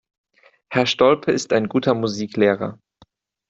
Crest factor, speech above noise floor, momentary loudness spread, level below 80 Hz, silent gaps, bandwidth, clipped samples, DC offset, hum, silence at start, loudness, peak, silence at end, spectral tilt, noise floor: 18 dB; 38 dB; 8 LU; -58 dBFS; none; 8 kHz; under 0.1%; under 0.1%; none; 0.7 s; -20 LUFS; -2 dBFS; 0.75 s; -5 dB/octave; -57 dBFS